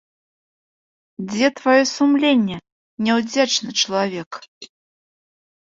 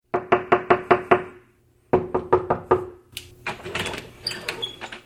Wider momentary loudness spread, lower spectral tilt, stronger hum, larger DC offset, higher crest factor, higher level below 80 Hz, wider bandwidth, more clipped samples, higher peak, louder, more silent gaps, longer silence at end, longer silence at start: first, 17 LU vs 14 LU; second, -3.5 dB/octave vs -5 dB/octave; neither; neither; second, 18 dB vs 24 dB; second, -64 dBFS vs -52 dBFS; second, 7.8 kHz vs 15 kHz; neither; about the same, -2 dBFS vs 0 dBFS; first, -18 LUFS vs -23 LUFS; first, 2.72-2.97 s, 4.26-4.31 s, 4.48-4.61 s vs none; first, 0.95 s vs 0.05 s; first, 1.2 s vs 0.15 s